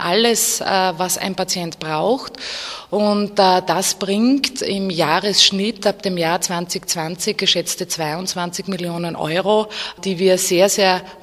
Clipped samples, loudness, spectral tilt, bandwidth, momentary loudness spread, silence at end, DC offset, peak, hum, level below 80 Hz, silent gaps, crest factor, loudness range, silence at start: under 0.1%; -18 LUFS; -3 dB/octave; 15.5 kHz; 10 LU; 0.05 s; under 0.1%; 0 dBFS; none; -56 dBFS; none; 18 dB; 4 LU; 0 s